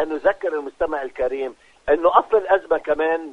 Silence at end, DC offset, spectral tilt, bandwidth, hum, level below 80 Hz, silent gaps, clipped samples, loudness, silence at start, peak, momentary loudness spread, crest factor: 0 s; under 0.1%; -5.5 dB/octave; 8.4 kHz; none; -50 dBFS; none; under 0.1%; -21 LUFS; 0 s; -2 dBFS; 10 LU; 20 dB